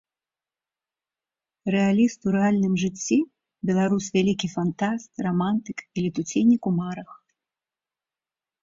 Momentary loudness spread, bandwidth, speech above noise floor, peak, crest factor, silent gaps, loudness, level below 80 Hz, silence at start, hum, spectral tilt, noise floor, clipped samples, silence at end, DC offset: 9 LU; 7.8 kHz; over 67 dB; -8 dBFS; 16 dB; none; -24 LUFS; -62 dBFS; 1.65 s; none; -6 dB/octave; under -90 dBFS; under 0.1%; 1.5 s; under 0.1%